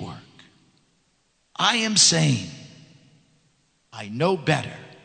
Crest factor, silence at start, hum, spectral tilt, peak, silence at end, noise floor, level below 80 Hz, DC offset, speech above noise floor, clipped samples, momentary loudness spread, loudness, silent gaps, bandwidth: 22 dB; 0 s; none; -3 dB/octave; -4 dBFS; 0.1 s; -67 dBFS; -64 dBFS; under 0.1%; 46 dB; under 0.1%; 25 LU; -20 LUFS; none; 9.4 kHz